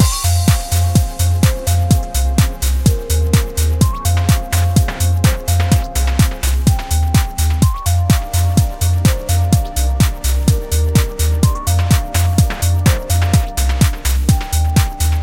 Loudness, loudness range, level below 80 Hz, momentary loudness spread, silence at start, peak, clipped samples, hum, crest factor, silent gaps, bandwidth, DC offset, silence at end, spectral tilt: -15 LUFS; 0 LU; -18 dBFS; 2 LU; 0 s; 0 dBFS; under 0.1%; none; 14 dB; none; 17 kHz; under 0.1%; 0 s; -5 dB/octave